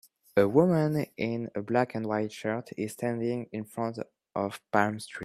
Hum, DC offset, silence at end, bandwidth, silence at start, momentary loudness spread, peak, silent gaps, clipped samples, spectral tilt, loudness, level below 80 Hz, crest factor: none; under 0.1%; 0 s; 14.5 kHz; 0.35 s; 11 LU; -6 dBFS; none; under 0.1%; -7 dB/octave; -29 LUFS; -68 dBFS; 22 dB